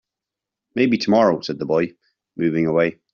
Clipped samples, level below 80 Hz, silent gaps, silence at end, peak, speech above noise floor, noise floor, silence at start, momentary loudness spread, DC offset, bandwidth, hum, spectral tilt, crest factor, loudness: under 0.1%; -60 dBFS; none; 0.2 s; -4 dBFS; 67 dB; -86 dBFS; 0.75 s; 11 LU; under 0.1%; 7.2 kHz; none; -5 dB/octave; 18 dB; -20 LUFS